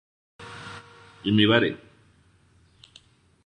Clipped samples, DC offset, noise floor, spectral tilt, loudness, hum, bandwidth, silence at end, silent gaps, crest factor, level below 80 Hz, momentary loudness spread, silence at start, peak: under 0.1%; under 0.1%; -60 dBFS; -6.5 dB/octave; -22 LUFS; none; 10.5 kHz; 1.7 s; none; 24 dB; -60 dBFS; 24 LU; 0.4 s; -4 dBFS